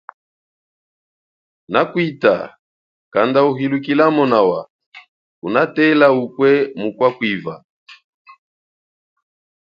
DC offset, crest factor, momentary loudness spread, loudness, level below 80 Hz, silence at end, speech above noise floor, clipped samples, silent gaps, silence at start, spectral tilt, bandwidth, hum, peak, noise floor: under 0.1%; 18 dB; 9 LU; -16 LUFS; -64 dBFS; 1.7 s; over 75 dB; under 0.1%; 2.59-3.11 s, 4.70-4.79 s, 4.86-4.92 s, 5.08-5.42 s, 7.64-7.86 s; 1.7 s; -8 dB/octave; 6.8 kHz; none; 0 dBFS; under -90 dBFS